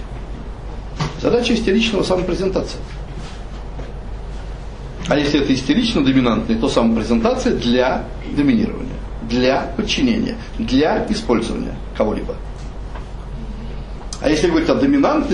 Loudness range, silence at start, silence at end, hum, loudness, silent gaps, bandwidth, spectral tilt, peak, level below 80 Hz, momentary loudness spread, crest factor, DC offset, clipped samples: 7 LU; 0 s; 0 s; none; -18 LUFS; none; 10.5 kHz; -5.5 dB/octave; -2 dBFS; -30 dBFS; 17 LU; 16 dB; under 0.1%; under 0.1%